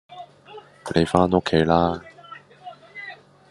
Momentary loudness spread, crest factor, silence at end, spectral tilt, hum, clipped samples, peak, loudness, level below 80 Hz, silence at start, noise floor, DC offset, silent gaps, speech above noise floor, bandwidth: 24 LU; 24 dB; 0.35 s; -6.5 dB/octave; none; under 0.1%; 0 dBFS; -20 LUFS; -52 dBFS; 0.1 s; -45 dBFS; under 0.1%; none; 26 dB; 11.5 kHz